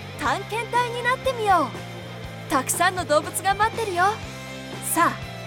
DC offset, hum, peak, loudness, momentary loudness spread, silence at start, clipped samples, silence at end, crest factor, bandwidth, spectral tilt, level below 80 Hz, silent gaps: under 0.1%; none; -6 dBFS; -23 LUFS; 14 LU; 0 s; under 0.1%; 0 s; 18 dB; 19 kHz; -3.5 dB/octave; -50 dBFS; none